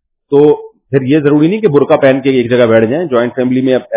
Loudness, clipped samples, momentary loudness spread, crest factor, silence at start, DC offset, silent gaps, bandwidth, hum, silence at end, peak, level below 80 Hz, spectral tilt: -10 LUFS; 0.8%; 5 LU; 10 dB; 0.3 s; under 0.1%; none; 4 kHz; none; 0 s; 0 dBFS; -52 dBFS; -11.5 dB/octave